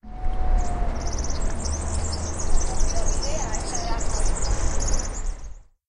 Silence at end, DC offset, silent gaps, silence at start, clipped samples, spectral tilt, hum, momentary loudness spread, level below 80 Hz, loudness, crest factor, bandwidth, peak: 0.25 s; under 0.1%; none; 0.05 s; under 0.1%; -4 dB/octave; none; 5 LU; -24 dBFS; -28 LUFS; 14 dB; 11 kHz; -6 dBFS